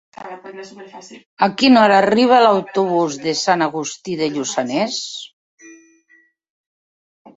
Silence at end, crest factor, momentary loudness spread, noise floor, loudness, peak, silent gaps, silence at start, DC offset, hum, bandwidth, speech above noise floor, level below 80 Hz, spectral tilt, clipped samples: 1.65 s; 18 dB; 23 LU; -56 dBFS; -16 LUFS; 0 dBFS; 1.26-1.37 s, 5.33-5.58 s; 0.2 s; under 0.1%; none; 8 kHz; 39 dB; -64 dBFS; -4 dB/octave; under 0.1%